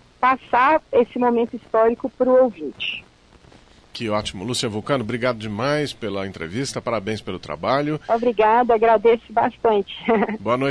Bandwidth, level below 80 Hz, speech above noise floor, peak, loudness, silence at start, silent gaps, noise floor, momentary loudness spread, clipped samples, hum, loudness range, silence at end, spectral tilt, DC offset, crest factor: 11 kHz; -52 dBFS; 30 dB; -6 dBFS; -20 LUFS; 0.2 s; none; -50 dBFS; 11 LU; under 0.1%; none; 6 LU; 0 s; -5 dB/octave; under 0.1%; 16 dB